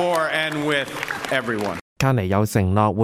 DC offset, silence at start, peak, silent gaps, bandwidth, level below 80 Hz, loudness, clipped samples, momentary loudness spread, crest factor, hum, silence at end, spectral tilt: under 0.1%; 0 s; -4 dBFS; 1.81-1.96 s; 16.5 kHz; -50 dBFS; -22 LUFS; under 0.1%; 7 LU; 18 dB; none; 0 s; -5.5 dB/octave